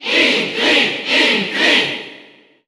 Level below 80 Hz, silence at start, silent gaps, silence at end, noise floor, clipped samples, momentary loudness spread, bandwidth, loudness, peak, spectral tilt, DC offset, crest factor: -58 dBFS; 0 s; none; 0.45 s; -45 dBFS; under 0.1%; 8 LU; 16.5 kHz; -13 LUFS; -2 dBFS; -2 dB/octave; under 0.1%; 16 dB